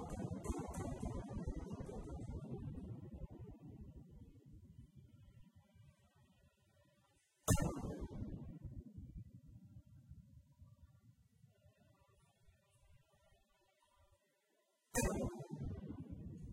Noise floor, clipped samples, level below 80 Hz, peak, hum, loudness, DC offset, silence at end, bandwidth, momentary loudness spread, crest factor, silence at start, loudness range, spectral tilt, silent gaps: -81 dBFS; under 0.1%; -56 dBFS; -20 dBFS; none; -46 LUFS; under 0.1%; 0 s; 15.5 kHz; 24 LU; 28 dB; 0 s; 20 LU; -5.5 dB/octave; none